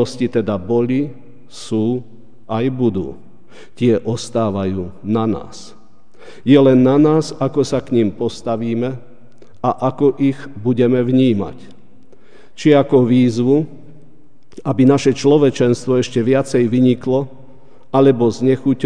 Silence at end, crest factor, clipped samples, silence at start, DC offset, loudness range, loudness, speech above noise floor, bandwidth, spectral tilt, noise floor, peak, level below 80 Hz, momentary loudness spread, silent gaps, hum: 0 s; 16 dB; under 0.1%; 0 s; 2%; 6 LU; -16 LUFS; 35 dB; 10 kHz; -7.5 dB/octave; -50 dBFS; 0 dBFS; -54 dBFS; 13 LU; none; none